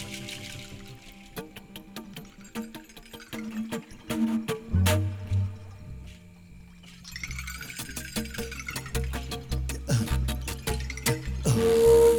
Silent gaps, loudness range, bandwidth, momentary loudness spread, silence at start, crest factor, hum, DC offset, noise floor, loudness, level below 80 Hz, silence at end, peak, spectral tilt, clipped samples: none; 10 LU; over 20 kHz; 20 LU; 0 s; 20 dB; none; under 0.1%; -49 dBFS; -29 LUFS; -38 dBFS; 0 s; -8 dBFS; -5.5 dB/octave; under 0.1%